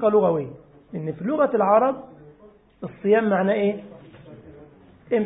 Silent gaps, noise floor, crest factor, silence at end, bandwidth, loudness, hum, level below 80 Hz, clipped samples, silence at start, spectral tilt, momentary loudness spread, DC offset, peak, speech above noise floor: none; -52 dBFS; 18 dB; 0 s; 3.9 kHz; -22 LUFS; none; -62 dBFS; under 0.1%; 0 s; -11.5 dB/octave; 18 LU; under 0.1%; -6 dBFS; 31 dB